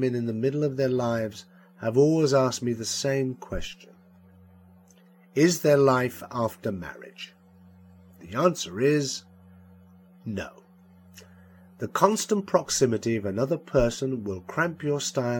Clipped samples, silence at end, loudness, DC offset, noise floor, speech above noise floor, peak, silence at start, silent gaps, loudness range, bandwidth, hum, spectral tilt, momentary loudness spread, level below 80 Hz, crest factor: under 0.1%; 0 s; -26 LUFS; under 0.1%; -56 dBFS; 30 dB; -4 dBFS; 0 s; none; 4 LU; 17.5 kHz; none; -5 dB/octave; 15 LU; -50 dBFS; 22 dB